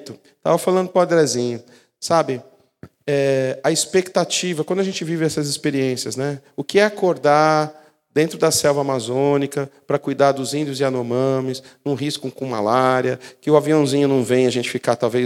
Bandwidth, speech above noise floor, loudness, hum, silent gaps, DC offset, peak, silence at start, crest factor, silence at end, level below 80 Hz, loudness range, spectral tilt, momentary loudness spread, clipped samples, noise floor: 16 kHz; 27 dB; -19 LUFS; none; none; under 0.1%; 0 dBFS; 0 s; 18 dB; 0 s; -68 dBFS; 2 LU; -4.5 dB/octave; 10 LU; under 0.1%; -46 dBFS